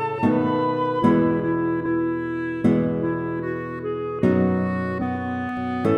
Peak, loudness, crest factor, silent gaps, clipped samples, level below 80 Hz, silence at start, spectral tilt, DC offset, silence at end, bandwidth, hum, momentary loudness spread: -6 dBFS; -23 LUFS; 16 dB; none; under 0.1%; -52 dBFS; 0 s; -9.5 dB/octave; under 0.1%; 0 s; 6.2 kHz; none; 8 LU